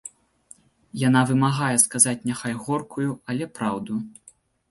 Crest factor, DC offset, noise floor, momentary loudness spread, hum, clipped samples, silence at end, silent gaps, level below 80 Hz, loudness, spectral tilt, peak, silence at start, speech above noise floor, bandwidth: 24 dB; under 0.1%; -53 dBFS; 13 LU; none; under 0.1%; 0.6 s; none; -62 dBFS; -22 LUFS; -4 dB/octave; 0 dBFS; 0.05 s; 30 dB; 12 kHz